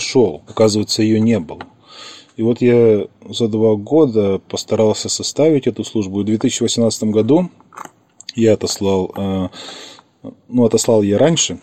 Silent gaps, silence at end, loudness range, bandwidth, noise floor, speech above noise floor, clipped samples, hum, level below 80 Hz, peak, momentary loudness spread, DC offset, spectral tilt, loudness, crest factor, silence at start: none; 0.05 s; 3 LU; 14.5 kHz; -38 dBFS; 23 dB; under 0.1%; none; -54 dBFS; 0 dBFS; 19 LU; 0.3%; -5 dB/octave; -16 LUFS; 16 dB; 0 s